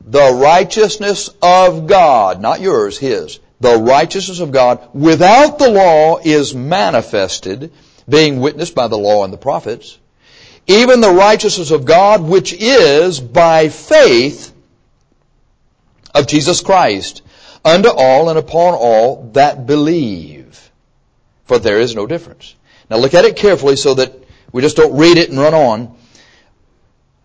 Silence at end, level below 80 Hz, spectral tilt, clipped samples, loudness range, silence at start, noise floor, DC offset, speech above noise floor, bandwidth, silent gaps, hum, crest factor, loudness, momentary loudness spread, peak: 1.4 s; -44 dBFS; -4.5 dB/octave; under 0.1%; 6 LU; 0.05 s; -55 dBFS; under 0.1%; 45 dB; 8 kHz; none; none; 12 dB; -10 LUFS; 11 LU; 0 dBFS